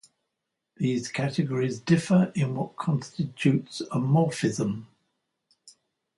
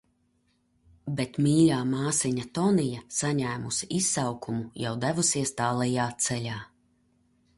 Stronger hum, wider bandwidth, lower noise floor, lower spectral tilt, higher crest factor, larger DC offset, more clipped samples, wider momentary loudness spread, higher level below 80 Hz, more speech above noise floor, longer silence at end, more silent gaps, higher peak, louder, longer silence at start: neither; about the same, 11.5 kHz vs 11.5 kHz; first, -83 dBFS vs -70 dBFS; first, -6.5 dB/octave vs -4.5 dB/octave; about the same, 18 dB vs 18 dB; neither; neither; about the same, 8 LU vs 10 LU; about the same, -66 dBFS vs -62 dBFS; first, 58 dB vs 43 dB; second, 0.5 s vs 0.9 s; neither; about the same, -8 dBFS vs -10 dBFS; about the same, -26 LUFS vs -27 LUFS; second, 0.8 s vs 1.05 s